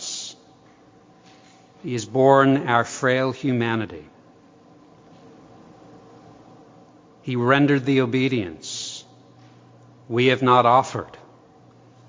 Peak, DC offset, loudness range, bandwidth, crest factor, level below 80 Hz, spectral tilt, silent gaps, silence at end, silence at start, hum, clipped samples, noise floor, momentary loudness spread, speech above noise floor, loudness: -2 dBFS; under 0.1%; 8 LU; 7.6 kHz; 22 dB; -62 dBFS; -5.5 dB/octave; none; 0.9 s; 0 s; none; under 0.1%; -52 dBFS; 18 LU; 33 dB; -20 LUFS